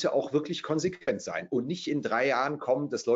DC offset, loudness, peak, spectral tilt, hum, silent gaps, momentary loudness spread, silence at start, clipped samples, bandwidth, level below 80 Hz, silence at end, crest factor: under 0.1%; -30 LUFS; -14 dBFS; -5 dB/octave; none; none; 5 LU; 0 s; under 0.1%; 8 kHz; -72 dBFS; 0 s; 16 dB